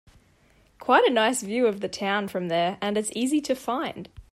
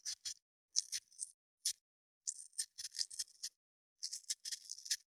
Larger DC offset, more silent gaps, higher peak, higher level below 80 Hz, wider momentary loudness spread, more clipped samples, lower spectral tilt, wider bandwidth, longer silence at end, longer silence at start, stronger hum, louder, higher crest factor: neither; second, none vs 0.42-0.68 s, 1.34-1.58 s, 1.81-2.21 s, 3.56-3.96 s; first, -6 dBFS vs -14 dBFS; first, -60 dBFS vs under -90 dBFS; about the same, 10 LU vs 9 LU; neither; first, -3.5 dB/octave vs 6.5 dB/octave; second, 14 kHz vs over 20 kHz; about the same, 0.1 s vs 0.2 s; first, 0.8 s vs 0.05 s; neither; first, -25 LUFS vs -43 LUFS; second, 20 dB vs 32 dB